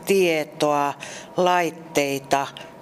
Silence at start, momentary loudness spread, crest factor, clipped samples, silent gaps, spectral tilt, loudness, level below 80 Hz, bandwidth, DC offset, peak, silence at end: 0 s; 9 LU; 18 dB; under 0.1%; none; -4 dB/octave; -22 LUFS; -66 dBFS; 15.5 kHz; under 0.1%; -6 dBFS; 0 s